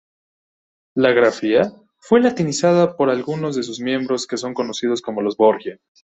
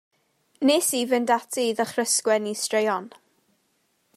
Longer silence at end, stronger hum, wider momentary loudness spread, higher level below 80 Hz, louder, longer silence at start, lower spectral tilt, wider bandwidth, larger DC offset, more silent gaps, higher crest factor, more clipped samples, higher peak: second, 0.4 s vs 1.1 s; neither; first, 9 LU vs 5 LU; first, -62 dBFS vs -82 dBFS; first, -19 LUFS vs -23 LUFS; first, 0.95 s vs 0.6 s; first, -5 dB/octave vs -2 dB/octave; second, 8.4 kHz vs 15.5 kHz; neither; neither; about the same, 16 dB vs 18 dB; neither; first, -2 dBFS vs -8 dBFS